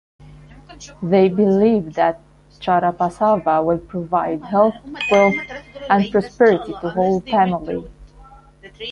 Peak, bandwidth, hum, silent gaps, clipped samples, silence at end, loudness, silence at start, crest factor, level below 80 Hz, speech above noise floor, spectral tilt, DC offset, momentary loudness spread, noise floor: -2 dBFS; 9.6 kHz; none; none; under 0.1%; 0 s; -18 LUFS; 0.3 s; 16 dB; -48 dBFS; 27 dB; -7 dB/octave; under 0.1%; 14 LU; -45 dBFS